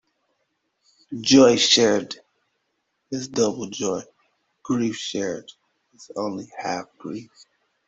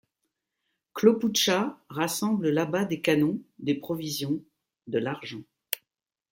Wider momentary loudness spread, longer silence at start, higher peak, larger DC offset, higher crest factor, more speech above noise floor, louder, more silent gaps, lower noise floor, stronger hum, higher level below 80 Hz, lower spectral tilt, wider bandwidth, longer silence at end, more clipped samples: first, 21 LU vs 11 LU; first, 1.1 s vs 0.95 s; first, -2 dBFS vs -6 dBFS; neither; about the same, 22 dB vs 22 dB; second, 53 dB vs 57 dB; first, -21 LUFS vs -27 LUFS; neither; second, -74 dBFS vs -83 dBFS; neither; first, -64 dBFS vs -70 dBFS; about the same, -3.5 dB/octave vs -4.5 dB/octave; second, 8 kHz vs 16.5 kHz; about the same, 0.65 s vs 0.55 s; neither